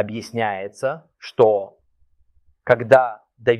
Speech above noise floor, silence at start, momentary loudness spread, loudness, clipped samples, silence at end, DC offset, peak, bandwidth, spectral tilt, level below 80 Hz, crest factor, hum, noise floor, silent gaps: 40 dB; 0 s; 18 LU; -19 LUFS; under 0.1%; 0 s; under 0.1%; -2 dBFS; 12 kHz; -6 dB/octave; -62 dBFS; 20 dB; none; -60 dBFS; none